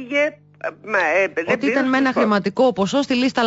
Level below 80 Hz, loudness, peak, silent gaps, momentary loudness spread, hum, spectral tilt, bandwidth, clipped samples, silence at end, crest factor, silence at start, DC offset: -60 dBFS; -19 LUFS; -6 dBFS; none; 6 LU; 50 Hz at -50 dBFS; -5 dB/octave; 8 kHz; under 0.1%; 0 s; 12 dB; 0 s; under 0.1%